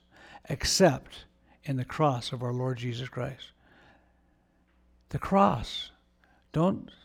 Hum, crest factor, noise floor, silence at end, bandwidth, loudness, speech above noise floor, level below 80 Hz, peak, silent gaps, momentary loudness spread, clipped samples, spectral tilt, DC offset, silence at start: none; 20 dB; -67 dBFS; 0.2 s; 17.5 kHz; -29 LUFS; 38 dB; -52 dBFS; -10 dBFS; none; 20 LU; under 0.1%; -5 dB/octave; under 0.1%; 0.3 s